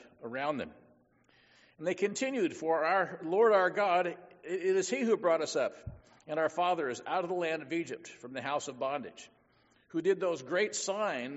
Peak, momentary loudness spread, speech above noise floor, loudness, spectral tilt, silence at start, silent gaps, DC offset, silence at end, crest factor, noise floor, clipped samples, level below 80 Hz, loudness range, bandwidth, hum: -14 dBFS; 13 LU; 36 dB; -32 LUFS; -3 dB/octave; 0.2 s; none; under 0.1%; 0 s; 18 dB; -68 dBFS; under 0.1%; -70 dBFS; 6 LU; 8 kHz; none